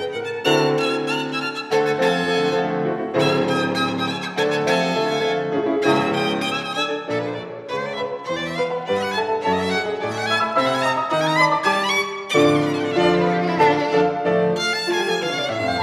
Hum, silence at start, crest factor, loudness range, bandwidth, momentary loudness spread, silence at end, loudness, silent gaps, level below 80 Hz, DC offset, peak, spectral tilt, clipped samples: none; 0 s; 18 dB; 5 LU; 14 kHz; 7 LU; 0 s; -20 LUFS; none; -62 dBFS; under 0.1%; -4 dBFS; -4.5 dB/octave; under 0.1%